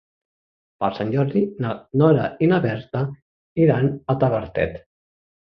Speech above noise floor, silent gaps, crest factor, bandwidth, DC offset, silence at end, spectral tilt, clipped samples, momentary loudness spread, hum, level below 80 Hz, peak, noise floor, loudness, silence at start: over 70 dB; 3.22-3.55 s; 20 dB; 5.6 kHz; under 0.1%; 0.65 s; -10.5 dB/octave; under 0.1%; 9 LU; none; -50 dBFS; -2 dBFS; under -90 dBFS; -21 LUFS; 0.8 s